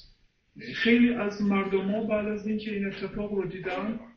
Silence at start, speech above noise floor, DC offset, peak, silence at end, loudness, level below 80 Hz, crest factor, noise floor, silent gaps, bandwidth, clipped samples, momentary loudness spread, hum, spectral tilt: 0.55 s; 34 dB; under 0.1%; -10 dBFS; 0.05 s; -28 LUFS; -56 dBFS; 18 dB; -62 dBFS; none; 6.4 kHz; under 0.1%; 11 LU; none; -7 dB/octave